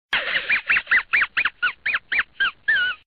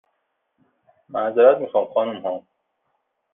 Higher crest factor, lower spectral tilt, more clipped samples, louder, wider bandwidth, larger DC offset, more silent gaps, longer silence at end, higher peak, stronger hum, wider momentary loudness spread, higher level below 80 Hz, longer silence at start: second, 14 dB vs 20 dB; about the same, -2.5 dB/octave vs -3.5 dB/octave; neither; about the same, -20 LUFS vs -20 LUFS; first, 10.5 kHz vs 3.8 kHz; first, 0.1% vs under 0.1%; neither; second, 0.2 s vs 0.95 s; second, -8 dBFS vs -2 dBFS; neither; second, 6 LU vs 15 LU; first, -56 dBFS vs -74 dBFS; second, 0.1 s vs 1.1 s